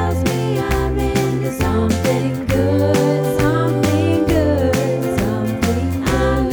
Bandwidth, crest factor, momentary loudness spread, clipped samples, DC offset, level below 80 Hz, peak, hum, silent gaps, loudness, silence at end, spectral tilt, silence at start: over 20 kHz; 14 dB; 3 LU; under 0.1%; under 0.1%; -28 dBFS; -2 dBFS; none; none; -17 LUFS; 0 s; -6.5 dB/octave; 0 s